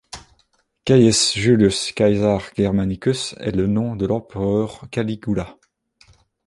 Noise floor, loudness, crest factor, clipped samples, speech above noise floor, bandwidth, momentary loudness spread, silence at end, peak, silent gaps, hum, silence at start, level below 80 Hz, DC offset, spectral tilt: -64 dBFS; -19 LUFS; 18 dB; under 0.1%; 46 dB; 11.5 kHz; 11 LU; 0.95 s; -2 dBFS; none; none; 0.15 s; -44 dBFS; under 0.1%; -5 dB/octave